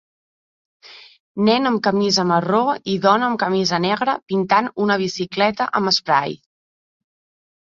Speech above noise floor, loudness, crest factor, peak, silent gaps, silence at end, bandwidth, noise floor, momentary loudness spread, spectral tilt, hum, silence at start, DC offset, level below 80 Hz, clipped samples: over 72 dB; -18 LUFS; 18 dB; -2 dBFS; 1.20-1.35 s; 1.3 s; 7.6 kHz; under -90 dBFS; 4 LU; -4.5 dB/octave; none; 0.9 s; under 0.1%; -62 dBFS; under 0.1%